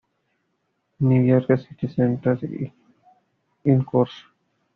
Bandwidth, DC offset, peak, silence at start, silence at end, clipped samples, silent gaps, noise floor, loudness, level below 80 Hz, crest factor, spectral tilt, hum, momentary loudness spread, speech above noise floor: 4.5 kHz; under 0.1%; -6 dBFS; 1 s; 0.55 s; under 0.1%; none; -73 dBFS; -22 LUFS; -60 dBFS; 18 dB; -9 dB/octave; none; 11 LU; 52 dB